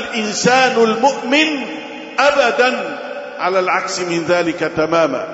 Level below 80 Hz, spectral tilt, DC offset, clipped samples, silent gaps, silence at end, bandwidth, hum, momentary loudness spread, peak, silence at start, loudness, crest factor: -56 dBFS; -3.5 dB/octave; under 0.1%; under 0.1%; none; 0 s; 8 kHz; none; 11 LU; -2 dBFS; 0 s; -15 LUFS; 16 dB